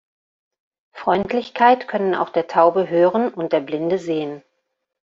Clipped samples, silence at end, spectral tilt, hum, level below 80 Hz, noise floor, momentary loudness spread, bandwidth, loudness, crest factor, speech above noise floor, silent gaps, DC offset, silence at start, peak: under 0.1%; 0.75 s; -4 dB/octave; none; -62 dBFS; -75 dBFS; 9 LU; 7.6 kHz; -19 LUFS; 18 dB; 56 dB; none; under 0.1%; 0.95 s; -2 dBFS